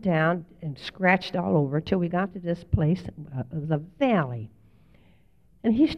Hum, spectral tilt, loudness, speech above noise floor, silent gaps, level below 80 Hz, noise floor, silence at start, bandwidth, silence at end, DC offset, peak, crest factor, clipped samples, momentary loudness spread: none; -8.5 dB/octave; -26 LUFS; 35 dB; none; -46 dBFS; -61 dBFS; 0 s; 6.6 kHz; 0 s; under 0.1%; -6 dBFS; 20 dB; under 0.1%; 13 LU